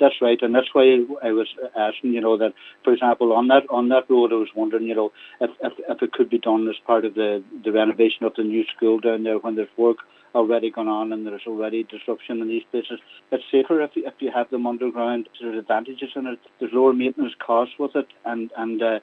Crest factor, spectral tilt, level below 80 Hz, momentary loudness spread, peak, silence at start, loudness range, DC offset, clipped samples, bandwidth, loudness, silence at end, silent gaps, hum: 18 dB; -7.5 dB/octave; -86 dBFS; 12 LU; -2 dBFS; 0 s; 5 LU; under 0.1%; under 0.1%; 4.1 kHz; -22 LUFS; 0.05 s; none; none